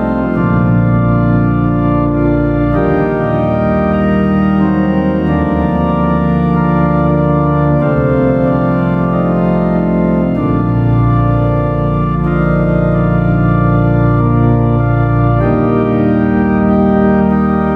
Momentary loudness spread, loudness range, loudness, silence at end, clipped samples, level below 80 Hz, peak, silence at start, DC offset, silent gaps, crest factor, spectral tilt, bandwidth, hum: 2 LU; 1 LU; -12 LUFS; 0 s; under 0.1%; -24 dBFS; 0 dBFS; 0 s; under 0.1%; none; 10 dB; -11 dB/octave; 4.8 kHz; none